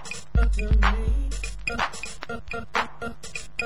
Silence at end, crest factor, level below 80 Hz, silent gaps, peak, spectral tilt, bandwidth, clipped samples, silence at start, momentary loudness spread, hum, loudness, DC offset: 0 s; 20 dB; -26 dBFS; none; -6 dBFS; -4.5 dB/octave; 11.5 kHz; under 0.1%; 0 s; 13 LU; none; -28 LUFS; 2%